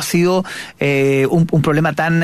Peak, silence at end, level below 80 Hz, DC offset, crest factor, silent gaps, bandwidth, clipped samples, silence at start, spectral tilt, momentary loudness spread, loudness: -2 dBFS; 0 s; -48 dBFS; under 0.1%; 12 dB; none; 14 kHz; under 0.1%; 0 s; -6 dB/octave; 5 LU; -15 LUFS